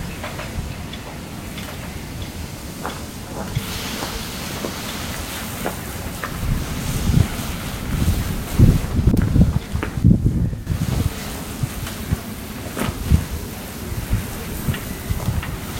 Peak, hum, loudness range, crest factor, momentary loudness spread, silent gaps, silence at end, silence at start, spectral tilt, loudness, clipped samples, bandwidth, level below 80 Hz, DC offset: 0 dBFS; none; 10 LU; 22 dB; 13 LU; none; 0 s; 0 s; -5.5 dB/octave; -23 LUFS; under 0.1%; 16.5 kHz; -28 dBFS; under 0.1%